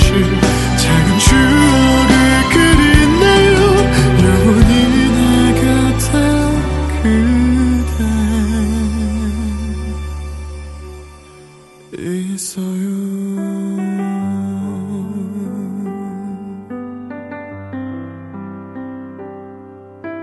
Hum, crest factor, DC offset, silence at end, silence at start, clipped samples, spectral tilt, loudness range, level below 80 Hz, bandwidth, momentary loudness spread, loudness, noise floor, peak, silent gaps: none; 14 dB; under 0.1%; 0 s; 0 s; under 0.1%; -5.5 dB/octave; 17 LU; -22 dBFS; 12.5 kHz; 20 LU; -13 LUFS; -41 dBFS; 0 dBFS; none